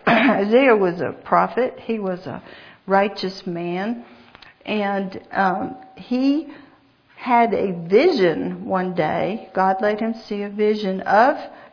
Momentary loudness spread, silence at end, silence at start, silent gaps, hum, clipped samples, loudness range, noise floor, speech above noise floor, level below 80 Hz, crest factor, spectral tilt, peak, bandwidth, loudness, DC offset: 12 LU; 0.05 s; 0.05 s; none; none; under 0.1%; 5 LU; -54 dBFS; 34 dB; -62 dBFS; 20 dB; -7.5 dB/octave; -2 dBFS; 5.4 kHz; -20 LUFS; under 0.1%